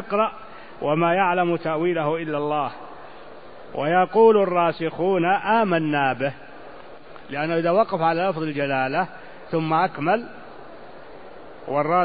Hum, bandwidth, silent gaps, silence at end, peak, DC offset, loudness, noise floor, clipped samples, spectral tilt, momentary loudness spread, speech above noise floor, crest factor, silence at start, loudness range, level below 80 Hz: none; 5 kHz; none; 0 s; -4 dBFS; 0.7%; -22 LUFS; -43 dBFS; under 0.1%; -11 dB/octave; 23 LU; 22 dB; 18 dB; 0 s; 5 LU; -60 dBFS